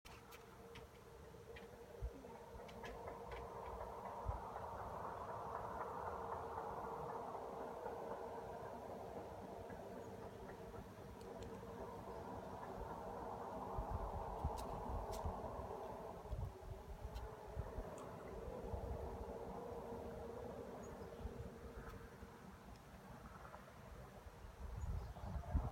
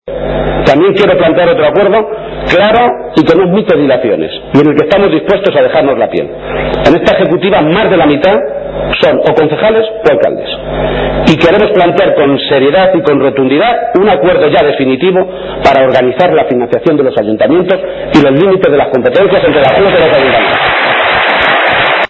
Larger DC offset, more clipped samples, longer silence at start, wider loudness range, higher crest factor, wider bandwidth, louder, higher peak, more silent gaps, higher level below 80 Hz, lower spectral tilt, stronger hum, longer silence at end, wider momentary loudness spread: neither; second, under 0.1% vs 1%; about the same, 0.05 s vs 0.05 s; first, 7 LU vs 2 LU; first, 22 dB vs 8 dB; first, 16.5 kHz vs 8 kHz; second, -51 LUFS vs -8 LUFS; second, -28 dBFS vs 0 dBFS; neither; second, -56 dBFS vs -30 dBFS; about the same, -6.5 dB/octave vs -7 dB/octave; neither; about the same, 0 s vs 0.05 s; first, 11 LU vs 6 LU